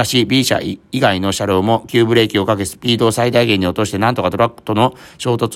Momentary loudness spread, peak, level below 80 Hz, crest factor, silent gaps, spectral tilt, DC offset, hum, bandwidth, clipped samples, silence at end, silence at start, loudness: 5 LU; 0 dBFS; -50 dBFS; 14 dB; none; -5 dB/octave; under 0.1%; none; 16.5 kHz; under 0.1%; 0 s; 0 s; -15 LUFS